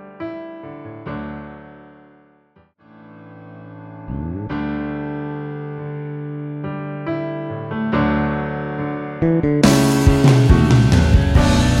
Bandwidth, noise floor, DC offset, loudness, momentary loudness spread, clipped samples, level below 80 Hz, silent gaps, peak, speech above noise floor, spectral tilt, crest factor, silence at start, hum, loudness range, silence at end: 16 kHz; -55 dBFS; under 0.1%; -18 LUFS; 21 LU; under 0.1%; -26 dBFS; none; 0 dBFS; 39 dB; -6.5 dB/octave; 18 dB; 0 s; none; 20 LU; 0 s